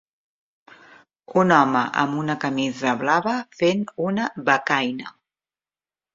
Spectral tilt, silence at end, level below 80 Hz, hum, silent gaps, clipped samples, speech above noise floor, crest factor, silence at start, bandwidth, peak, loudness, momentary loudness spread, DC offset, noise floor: -5.5 dB/octave; 1.05 s; -66 dBFS; none; none; under 0.1%; over 69 dB; 22 dB; 1.3 s; 7.8 kHz; -2 dBFS; -21 LUFS; 8 LU; under 0.1%; under -90 dBFS